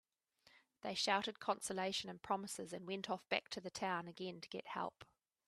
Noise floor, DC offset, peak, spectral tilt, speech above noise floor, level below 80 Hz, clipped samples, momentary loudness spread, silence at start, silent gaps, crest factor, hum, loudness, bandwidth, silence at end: -74 dBFS; under 0.1%; -20 dBFS; -3 dB/octave; 31 dB; -82 dBFS; under 0.1%; 10 LU; 0.55 s; none; 24 dB; none; -43 LUFS; 13.5 kHz; 0.45 s